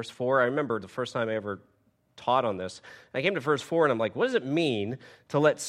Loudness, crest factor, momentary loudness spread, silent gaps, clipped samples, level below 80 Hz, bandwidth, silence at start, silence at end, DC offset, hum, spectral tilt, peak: -28 LUFS; 20 dB; 12 LU; none; under 0.1%; -72 dBFS; 14 kHz; 0 s; 0 s; under 0.1%; none; -5 dB/octave; -8 dBFS